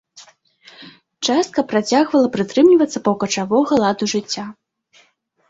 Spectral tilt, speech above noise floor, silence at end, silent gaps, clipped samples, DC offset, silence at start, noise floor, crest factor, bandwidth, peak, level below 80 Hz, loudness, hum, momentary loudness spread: -4.5 dB/octave; 42 dB; 0.95 s; none; under 0.1%; under 0.1%; 0.15 s; -58 dBFS; 16 dB; 8 kHz; -2 dBFS; -60 dBFS; -17 LUFS; none; 10 LU